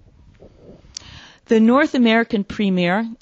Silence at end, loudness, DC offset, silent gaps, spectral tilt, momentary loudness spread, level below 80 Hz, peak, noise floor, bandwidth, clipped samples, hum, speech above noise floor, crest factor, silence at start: 0.1 s; -17 LUFS; under 0.1%; none; -6 dB/octave; 21 LU; -52 dBFS; -2 dBFS; -47 dBFS; 7.8 kHz; under 0.1%; none; 31 dB; 16 dB; 1.15 s